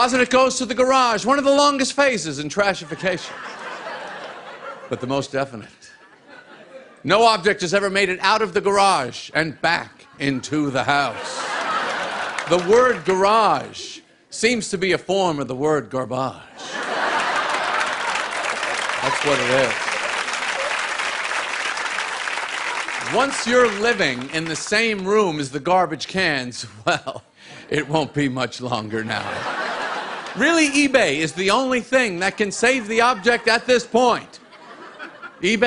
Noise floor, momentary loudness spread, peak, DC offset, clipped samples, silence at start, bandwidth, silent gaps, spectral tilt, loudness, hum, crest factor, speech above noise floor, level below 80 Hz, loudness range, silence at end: -47 dBFS; 14 LU; -2 dBFS; under 0.1%; under 0.1%; 0 s; 11 kHz; none; -3.5 dB/octave; -20 LUFS; none; 20 dB; 28 dB; -56 dBFS; 6 LU; 0 s